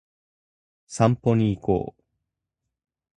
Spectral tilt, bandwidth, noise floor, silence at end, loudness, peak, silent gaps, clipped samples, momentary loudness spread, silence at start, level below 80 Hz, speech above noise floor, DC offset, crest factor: -7.5 dB/octave; 11 kHz; -83 dBFS; 1.25 s; -23 LUFS; -4 dBFS; none; under 0.1%; 15 LU; 0.9 s; -50 dBFS; 62 dB; under 0.1%; 22 dB